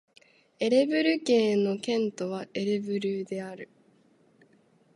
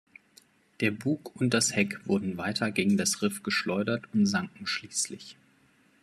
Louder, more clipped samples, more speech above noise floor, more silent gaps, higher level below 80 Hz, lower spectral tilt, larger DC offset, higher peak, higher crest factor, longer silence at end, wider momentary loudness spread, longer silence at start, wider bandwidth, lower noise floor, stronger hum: about the same, -27 LUFS vs -28 LUFS; neither; about the same, 36 dB vs 35 dB; neither; second, -80 dBFS vs -72 dBFS; first, -5.5 dB/octave vs -4 dB/octave; neither; about the same, -10 dBFS vs -12 dBFS; about the same, 18 dB vs 18 dB; first, 1.3 s vs 0.7 s; first, 13 LU vs 7 LU; second, 0.6 s vs 0.8 s; second, 11.5 kHz vs 13.5 kHz; about the same, -63 dBFS vs -64 dBFS; neither